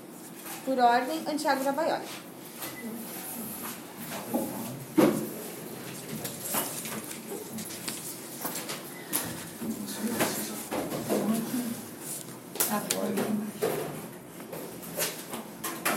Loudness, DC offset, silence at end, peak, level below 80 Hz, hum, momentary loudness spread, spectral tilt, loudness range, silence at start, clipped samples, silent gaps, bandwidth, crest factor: -32 LUFS; under 0.1%; 0 s; -8 dBFS; -70 dBFS; none; 13 LU; -3.5 dB/octave; 5 LU; 0 s; under 0.1%; none; 16.5 kHz; 24 dB